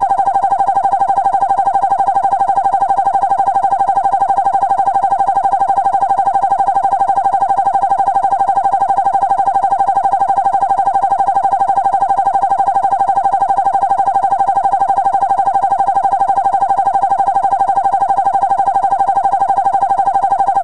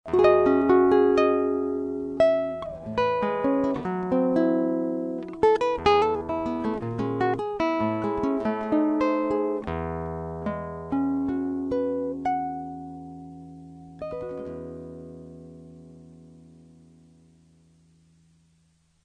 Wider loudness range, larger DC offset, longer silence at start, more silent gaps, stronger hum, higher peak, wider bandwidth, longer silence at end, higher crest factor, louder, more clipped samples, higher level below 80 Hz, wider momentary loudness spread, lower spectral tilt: second, 0 LU vs 16 LU; first, 2% vs under 0.1%; about the same, 0 s vs 0.05 s; neither; neither; first, -4 dBFS vs -8 dBFS; first, 10 kHz vs 9 kHz; second, 0 s vs 2.75 s; second, 10 dB vs 18 dB; first, -13 LUFS vs -25 LUFS; neither; about the same, -48 dBFS vs -52 dBFS; second, 0 LU vs 20 LU; second, -5 dB/octave vs -7.5 dB/octave